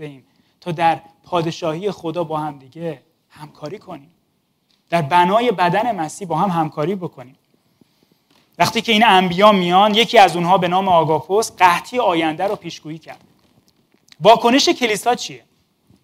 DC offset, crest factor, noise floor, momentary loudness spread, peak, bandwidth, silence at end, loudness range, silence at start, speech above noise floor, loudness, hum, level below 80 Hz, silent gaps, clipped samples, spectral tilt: under 0.1%; 18 dB; -66 dBFS; 20 LU; 0 dBFS; 16 kHz; 0.65 s; 10 LU; 0 s; 49 dB; -16 LUFS; none; -60 dBFS; none; under 0.1%; -4.5 dB/octave